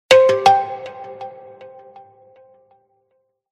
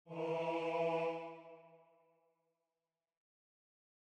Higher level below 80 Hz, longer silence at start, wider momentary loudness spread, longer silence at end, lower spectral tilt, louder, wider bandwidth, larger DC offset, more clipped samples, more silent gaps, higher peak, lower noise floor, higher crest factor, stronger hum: first, -66 dBFS vs under -90 dBFS; about the same, 0.1 s vs 0.05 s; first, 26 LU vs 17 LU; about the same, 2.2 s vs 2.3 s; second, -2.5 dB/octave vs -6.5 dB/octave; first, -14 LUFS vs -39 LUFS; first, 13 kHz vs 9.2 kHz; neither; neither; neither; first, 0 dBFS vs -26 dBFS; second, -68 dBFS vs under -90 dBFS; about the same, 20 dB vs 18 dB; neither